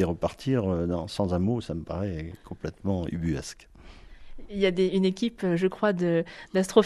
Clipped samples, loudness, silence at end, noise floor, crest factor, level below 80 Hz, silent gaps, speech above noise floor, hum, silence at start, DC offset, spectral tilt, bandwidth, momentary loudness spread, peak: under 0.1%; -28 LUFS; 0 s; -47 dBFS; 22 dB; -50 dBFS; none; 20 dB; none; 0 s; under 0.1%; -6.5 dB/octave; 12.5 kHz; 13 LU; -6 dBFS